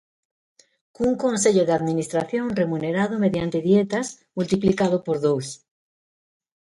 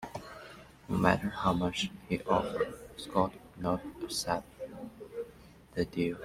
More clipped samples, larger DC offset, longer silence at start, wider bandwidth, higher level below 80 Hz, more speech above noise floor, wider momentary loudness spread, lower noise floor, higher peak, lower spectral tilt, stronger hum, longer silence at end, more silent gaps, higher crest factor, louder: neither; neither; first, 1 s vs 0 s; second, 11.5 kHz vs 16 kHz; about the same, -56 dBFS vs -56 dBFS; first, over 68 dB vs 23 dB; second, 8 LU vs 16 LU; first, under -90 dBFS vs -55 dBFS; about the same, -6 dBFS vs -8 dBFS; about the same, -5.5 dB/octave vs -5 dB/octave; neither; first, 1.1 s vs 0 s; neither; second, 18 dB vs 26 dB; first, -22 LUFS vs -33 LUFS